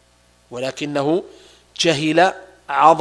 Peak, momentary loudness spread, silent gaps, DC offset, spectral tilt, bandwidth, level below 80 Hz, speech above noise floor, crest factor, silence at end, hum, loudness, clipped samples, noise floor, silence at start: 0 dBFS; 19 LU; none; under 0.1%; -4 dB/octave; 11 kHz; -60 dBFS; 38 dB; 20 dB; 0 s; 60 Hz at -55 dBFS; -19 LUFS; under 0.1%; -55 dBFS; 0.5 s